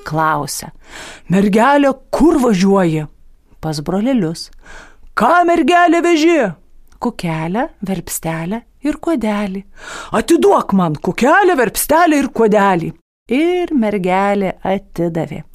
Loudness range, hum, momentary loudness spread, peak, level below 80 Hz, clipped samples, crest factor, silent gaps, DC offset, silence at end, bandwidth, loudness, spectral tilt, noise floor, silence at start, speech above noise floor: 5 LU; none; 13 LU; -2 dBFS; -40 dBFS; under 0.1%; 14 dB; 13.01-13.26 s; under 0.1%; 0.1 s; 15.5 kHz; -15 LUFS; -5.5 dB/octave; -39 dBFS; 0.05 s; 25 dB